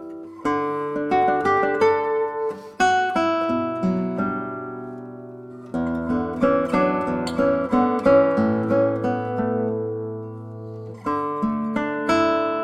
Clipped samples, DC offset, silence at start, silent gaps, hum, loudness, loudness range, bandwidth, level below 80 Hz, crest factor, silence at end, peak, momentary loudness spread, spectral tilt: under 0.1%; under 0.1%; 0 s; none; none; -22 LUFS; 5 LU; 11.5 kHz; -52 dBFS; 18 dB; 0 s; -4 dBFS; 15 LU; -6.5 dB/octave